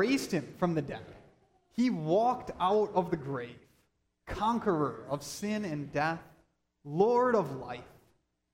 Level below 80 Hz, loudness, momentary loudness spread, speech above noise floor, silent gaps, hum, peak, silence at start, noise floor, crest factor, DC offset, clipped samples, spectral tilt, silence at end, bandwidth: -60 dBFS; -31 LUFS; 14 LU; 43 dB; none; none; -14 dBFS; 0 s; -74 dBFS; 18 dB; under 0.1%; under 0.1%; -6 dB/octave; 0.7 s; 16 kHz